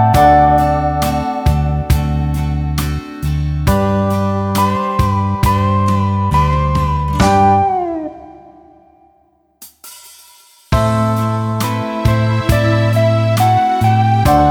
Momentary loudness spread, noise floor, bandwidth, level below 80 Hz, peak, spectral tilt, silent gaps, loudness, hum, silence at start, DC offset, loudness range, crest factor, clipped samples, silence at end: 8 LU; -55 dBFS; 19 kHz; -24 dBFS; 0 dBFS; -7 dB/octave; none; -14 LUFS; none; 0 s; under 0.1%; 6 LU; 14 dB; under 0.1%; 0 s